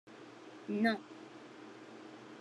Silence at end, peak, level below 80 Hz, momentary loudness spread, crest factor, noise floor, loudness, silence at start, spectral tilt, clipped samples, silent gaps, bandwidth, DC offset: 0 s; -18 dBFS; under -90 dBFS; 20 LU; 22 dB; -53 dBFS; -36 LUFS; 0.05 s; -6 dB/octave; under 0.1%; none; 12 kHz; under 0.1%